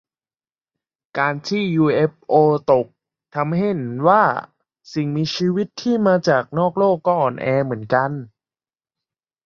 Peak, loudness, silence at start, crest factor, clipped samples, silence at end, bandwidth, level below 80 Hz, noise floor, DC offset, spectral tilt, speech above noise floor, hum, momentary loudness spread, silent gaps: -2 dBFS; -19 LUFS; 1.15 s; 18 dB; under 0.1%; 1.2 s; 7.2 kHz; -62 dBFS; under -90 dBFS; under 0.1%; -7 dB/octave; over 72 dB; none; 10 LU; none